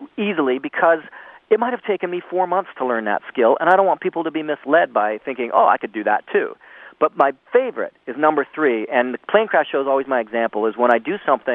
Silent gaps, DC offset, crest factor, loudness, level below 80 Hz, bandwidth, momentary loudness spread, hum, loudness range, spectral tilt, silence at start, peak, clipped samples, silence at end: none; under 0.1%; 18 dB; -19 LUFS; -74 dBFS; 4 kHz; 7 LU; none; 2 LU; -7.5 dB/octave; 0 s; 0 dBFS; under 0.1%; 0 s